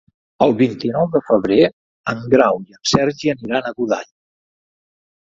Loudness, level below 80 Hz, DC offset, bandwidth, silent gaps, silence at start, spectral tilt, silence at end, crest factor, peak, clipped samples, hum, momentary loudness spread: -17 LUFS; -52 dBFS; under 0.1%; 7.8 kHz; 1.73-2.04 s; 0.4 s; -5.5 dB/octave; 1.3 s; 18 dB; 0 dBFS; under 0.1%; none; 8 LU